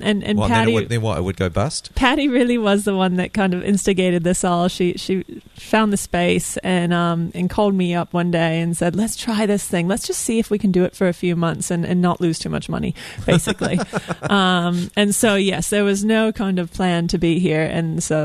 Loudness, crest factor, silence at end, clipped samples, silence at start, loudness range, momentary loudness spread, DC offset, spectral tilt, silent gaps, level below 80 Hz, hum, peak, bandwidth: -19 LUFS; 16 dB; 0 s; under 0.1%; 0 s; 2 LU; 6 LU; under 0.1%; -5 dB/octave; none; -40 dBFS; none; -2 dBFS; 13.5 kHz